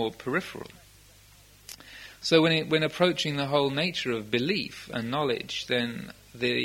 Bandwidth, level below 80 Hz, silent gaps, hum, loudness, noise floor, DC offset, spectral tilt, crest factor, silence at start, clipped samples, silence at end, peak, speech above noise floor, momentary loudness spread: 16.5 kHz; -60 dBFS; none; none; -27 LUFS; -55 dBFS; under 0.1%; -5 dB/octave; 22 dB; 0 s; under 0.1%; 0 s; -8 dBFS; 28 dB; 20 LU